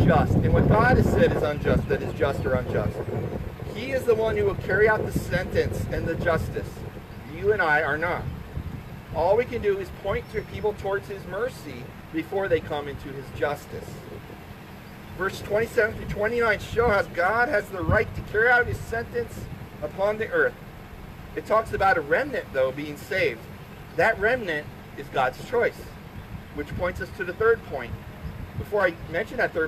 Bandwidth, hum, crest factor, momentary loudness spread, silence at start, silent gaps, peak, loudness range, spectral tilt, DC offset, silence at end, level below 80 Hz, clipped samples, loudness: 14.5 kHz; none; 18 dB; 18 LU; 0 s; none; -8 dBFS; 6 LU; -6.5 dB/octave; under 0.1%; 0 s; -40 dBFS; under 0.1%; -25 LUFS